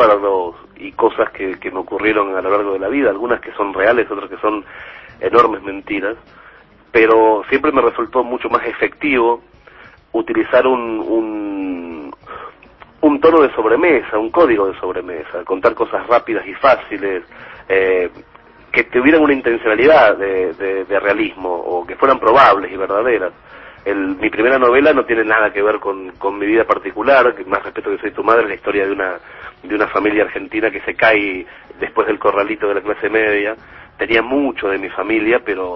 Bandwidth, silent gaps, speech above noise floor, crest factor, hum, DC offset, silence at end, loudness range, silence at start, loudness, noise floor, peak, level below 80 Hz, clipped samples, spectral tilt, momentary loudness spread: 6 kHz; none; 29 dB; 16 dB; none; under 0.1%; 0 s; 4 LU; 0 s; -15 LUFS; -44 dBFS; 0 dBFS; -48 dBFS; under 0.1%; -7 dB/octave; 13 LU